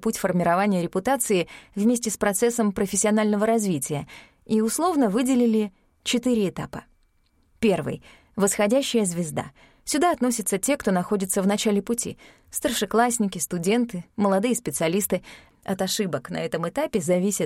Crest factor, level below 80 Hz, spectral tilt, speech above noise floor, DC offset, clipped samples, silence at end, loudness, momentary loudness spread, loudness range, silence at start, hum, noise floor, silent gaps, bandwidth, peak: 16 dB; -56 dBFS; -4.5 dB/octave; 40 dB; under 0.1%; under 0.1%; 0 s; -24 LUFS; 11 LU; 3 LU; 0 s; none; -64 dBFS; none; 16.5 kHz; -6 dBFS